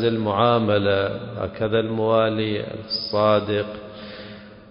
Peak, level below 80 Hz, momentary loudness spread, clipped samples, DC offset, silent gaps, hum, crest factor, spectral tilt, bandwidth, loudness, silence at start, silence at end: -6 dBFS; -50 dBFS; 18 LU; under 0.1%; under 0.1%; none; none; 16 dB; -10 dB/octave; 5.4 kHz; -22 LUFS; 0 s; 0 s